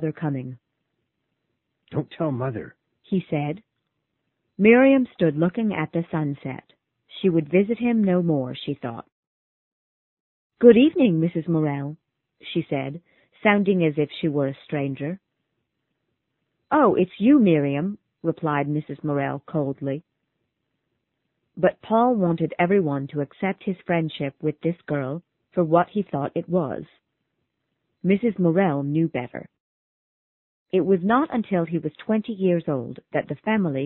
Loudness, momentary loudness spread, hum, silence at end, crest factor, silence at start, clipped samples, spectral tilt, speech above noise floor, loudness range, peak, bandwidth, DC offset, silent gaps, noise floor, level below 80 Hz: -23 LUFS; 13 LU; none; 0 s; 22 dB; 0 s; under 0.1%; -12 dB/octave; 55 dB; 6 LU; -2 dBFS; 4.2 kHz; under 0.1%; 9.12-10.50 s, 29.60-30.66 s; -77 dBFS; -62 dBFS